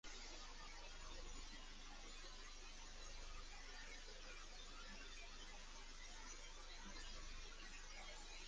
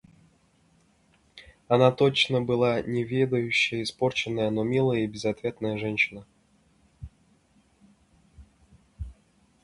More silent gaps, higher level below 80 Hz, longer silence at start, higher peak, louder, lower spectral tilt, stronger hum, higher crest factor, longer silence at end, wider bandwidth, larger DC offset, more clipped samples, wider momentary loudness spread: neither; about the same, -58 dBFS vs -54 dBFS; second, 0.05 s vs 1.35 s; second, -42 dBFS vs -6 dBFS; second, -57 LUFS vs -25 LUFS; second, -1.5 dB/octave vs -5.5 dB/octave; neither; second, 12 dB vs 22 dB; second, 0 s vs 0.5 s; second, 10 kHz vs 11.5 kHz; neither; neither; second, 2 LU vs 22 LU